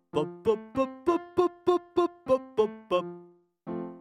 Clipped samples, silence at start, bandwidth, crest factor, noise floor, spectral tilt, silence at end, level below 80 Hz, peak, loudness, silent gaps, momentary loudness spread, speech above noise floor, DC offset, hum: under 0.1%; 0.15 s; 10.5 kHz; 18 dB; -54 dBFS; -7 dB/octave; 0 s; -64 dBFS; -12 dBFS; -29 LUFS; none; 12 LU; 26 dB; under 0.1%; none